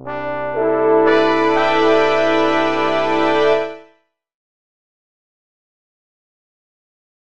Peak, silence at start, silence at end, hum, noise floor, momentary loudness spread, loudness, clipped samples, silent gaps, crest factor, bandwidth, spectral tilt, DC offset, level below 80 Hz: -2 dBFS; 0 s; 2.85 s; none; -58 dBFS; 7 LU; -15 LUFS; under 0.1%; none; 16 dB; 8.4 kHz; -5 dB/octave; 3%; -56 dBFS